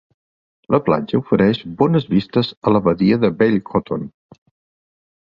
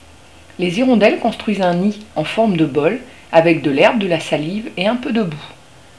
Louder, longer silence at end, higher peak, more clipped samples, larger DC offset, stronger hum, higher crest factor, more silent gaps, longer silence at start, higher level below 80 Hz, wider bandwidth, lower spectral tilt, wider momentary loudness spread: about the same, -18 LUFS vs -16 LUFS; first, 1.1 s vs 0.45 s; about the same, -2 dBFS vs 0 dBFS; neither; second, under 0.1% vs 0.4%; neither; about the same, 18 dB vs 16 dB; first, 2.57-2.62 s vs none; about the same, 0.7 s vs 0.6 s; about the same, -50 dBFS vs -52 dBFS; second, 5.6 kHz vs 11 kHz; first, -9.5 dB/octave vs -6.5 dB/octave; second, 6 LU vs 10 LU